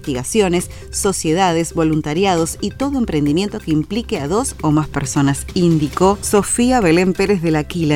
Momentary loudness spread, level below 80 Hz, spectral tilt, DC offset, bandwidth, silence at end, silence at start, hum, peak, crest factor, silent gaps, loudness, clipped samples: 6 LU; -36 dBFS; -5 dB/octave; under 0.1%; 17 kHz; 0 s; 0 s; none; 0 dBFS; 16 dB; none; -17 LUFS; under 0.1%